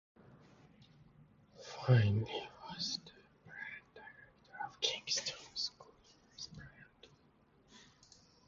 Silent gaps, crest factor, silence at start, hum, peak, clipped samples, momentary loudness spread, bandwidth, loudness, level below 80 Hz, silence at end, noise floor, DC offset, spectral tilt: none; 24 dB; 0.35 s; none; -16 dBFS; under 0.1%; 28 LU; 7.4 kHz; -38 LUFS; -66 dBFS; 0.65 s; -69 dBFS; under 0.1%; -4 dB/octave